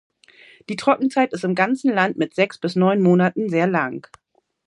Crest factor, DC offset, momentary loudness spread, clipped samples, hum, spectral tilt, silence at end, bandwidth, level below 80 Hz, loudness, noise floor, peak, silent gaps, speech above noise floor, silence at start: 18 dB; under 0.1%; 7 LU; under 0.1%; none; -7 dB/octave; 0.65 s; 11 kHz; -68 dBFS; -19 LUFS; -50 dBFS; -2 dBFS; none; 31 dB; 0.7 s